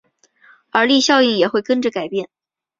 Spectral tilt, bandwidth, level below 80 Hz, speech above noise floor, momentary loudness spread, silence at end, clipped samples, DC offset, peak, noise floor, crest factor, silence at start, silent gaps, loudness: -3 dB/octave; 7.8 kHz; -64 dBFS; 36 dB; 12 LU; 0.55 s; under 0.1%; under 0.1%; 0 dBFS; -52 dBFS; 18 dB; 0.75 s; none; -16 LUFS